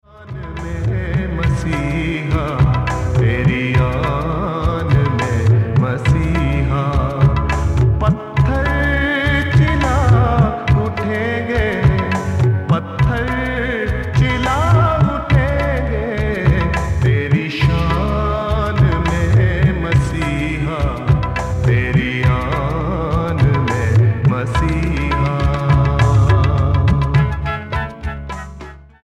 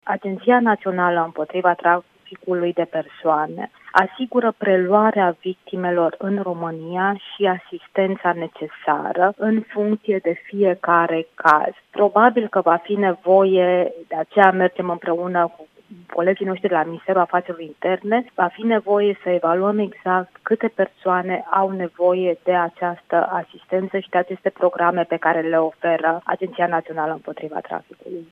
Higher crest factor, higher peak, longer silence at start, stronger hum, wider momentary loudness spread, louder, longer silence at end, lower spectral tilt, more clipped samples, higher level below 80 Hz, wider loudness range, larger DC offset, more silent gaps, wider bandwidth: second, 14 dB vs 20 dB; about the same, 0 dBFS vs 0 dBFS; first, 0.2 s vs 0.05 s; neither; second, 6 LU vs 10 LU; first, -16 LUFS vs -20 LUFS; first, 0.2 s vs 0.05 s; about the same, -7.5 dB/octave vs -8 dB/octave; neither; first, -24 dBFS vs -72 dBFS; second, 2 LU vs 5 LU; neither; neither; first, 10 kHz vs 6.4 kHz